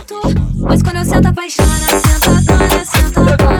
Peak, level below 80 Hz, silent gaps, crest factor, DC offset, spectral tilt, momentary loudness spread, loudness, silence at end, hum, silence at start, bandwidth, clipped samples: 0 dBFS; -16 dBFS; none; 10 dB; under 0.1%; -5 dB/octave; 5 LU; -12 LUFS; 0 s; none; 0 s; over 20 kHz; under 0.1%